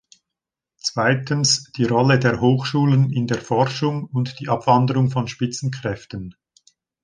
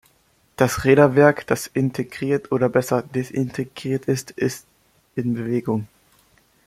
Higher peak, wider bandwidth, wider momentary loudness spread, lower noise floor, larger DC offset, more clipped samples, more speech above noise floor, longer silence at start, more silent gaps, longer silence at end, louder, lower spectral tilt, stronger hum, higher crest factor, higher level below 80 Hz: about the same, -2 dBFS vs -2 dBFS; second, 10 kHz vs 16 kHz; about the same, 11 LU vs 12 LU; first, -86 dBFS vs -61 dBFS; neither; neither; first, 66 dB vs 41 dB; first, 0.85 s vs 0.6 s; neither; about the same, 0.7 s vs 0.8 s; about the same, -20 LUFS vs -21 LUFS; about the same, -5 dB/octave vs -6 dB/octave; neither; about the same, 18 dB vs 20 dB; about the same, -54 dBFS vs -54 dBFS